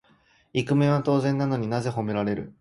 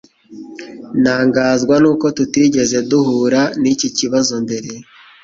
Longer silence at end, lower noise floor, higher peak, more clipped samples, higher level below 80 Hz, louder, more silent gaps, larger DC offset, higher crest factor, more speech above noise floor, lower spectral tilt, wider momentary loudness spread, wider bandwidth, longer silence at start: second, 0.1 s vs 0.4 s; first, -61 dBFS vs -35 dBFS; second, -10 dBFS vs -2 dBFS; neither; about the same, -58 dBFS vs -54 dBFS; second, -25 LUFS vs -14 LUFS; neither; neither; about the same, 16 dB vs 14 dB; first, 37 dB vs 21 dB; first, -7.5 dB/octave vs -4.5 dB/octave; second, 8 LU vs 19 LU; first, 11.5 kHz vs 7.8 kHz; first, 0.55 s vs 0.3 s